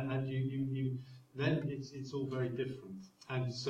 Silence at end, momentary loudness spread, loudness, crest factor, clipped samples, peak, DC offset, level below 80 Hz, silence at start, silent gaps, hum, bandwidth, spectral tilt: 0 s; 13 LU; -39 LUFS; 16 dB; under 0.1%; -22 dBFS; under 0.1%; -72 dBFS; 0 s; none; none; 7.8 kHz; -7 dB/octave